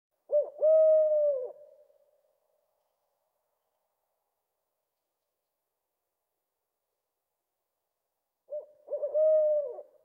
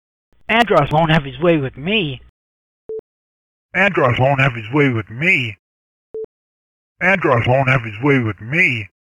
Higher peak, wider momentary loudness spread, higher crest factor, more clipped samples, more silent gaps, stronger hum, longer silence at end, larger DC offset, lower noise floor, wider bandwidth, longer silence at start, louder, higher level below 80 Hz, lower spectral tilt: second, -16 dBFS vs -2 dBFS; about the same, 20 LU vs 18 LU; about the same, 16 dB vs 16 dB; neither; second, none vs 2.29-2.89 s, 2.99-3.69 s, 5.59-6.14 s, 6.24-6.96 s; neither; about the same, 0.2 s vs 0.3 s; neither; second, -86 dBFS vs under -90 dBFS; second, 2 kHz vs 11 kHz; second, 0.3 s vs 0.5 s; second, -26 LUFS vs -16 LUFS; second, under -90 dBFS vs -44 dBFS; about the same, -6.5 dB/octave vs -7 dB/octave